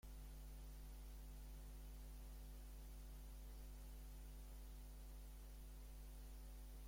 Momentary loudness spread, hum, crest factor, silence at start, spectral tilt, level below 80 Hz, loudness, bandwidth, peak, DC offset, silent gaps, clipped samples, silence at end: 1 LU; none; 8 dB; 0.05 s; -5 dB/octave; -56 dBFS; -59 LUFS; 16.5 kHz; -48 dBFS; under 0.1%; none; under 0.1%; 0 s